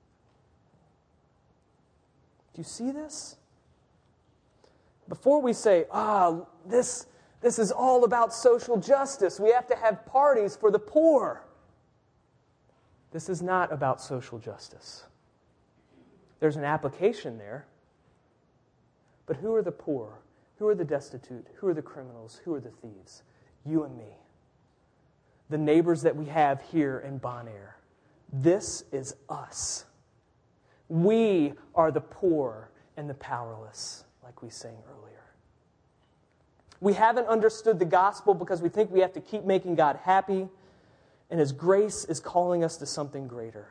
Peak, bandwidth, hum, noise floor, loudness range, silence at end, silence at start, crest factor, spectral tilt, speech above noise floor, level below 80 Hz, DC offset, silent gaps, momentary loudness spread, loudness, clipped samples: -8 dBFS; 10.5 kHz; none; -67 dBFS; 14 LU; 0.1 s; 2.55 s; 20 dB; -5.5 dB/octave; 40 dB; -68 dBFS; under 0.1%; none; 20 LU; -27 LUFS; under 0.1%